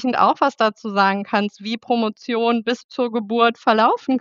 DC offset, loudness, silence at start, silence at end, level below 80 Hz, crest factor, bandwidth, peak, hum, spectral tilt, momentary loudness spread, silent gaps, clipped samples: under 0.1%; -19 LUFS; 0 s; 0 s; -76 dBFS; 18 dB; 7.4 kHz; -2 dBFS; none; -5.5 dB/octave; 7 LU; 2.84-2.89 s; under 0.1%